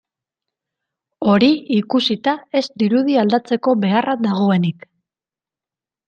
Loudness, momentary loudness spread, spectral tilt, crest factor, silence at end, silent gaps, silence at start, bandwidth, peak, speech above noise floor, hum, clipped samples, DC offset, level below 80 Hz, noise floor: -17 LUFS; 6 LU; -7 dB/octave; 16 dB; 1.35 s; none; 1.2 s; 7.2 kHz; -2 dBFS; over 74 dB; none; under 0.1%; under 0.1%; -62 dBFS; under -90 dBFS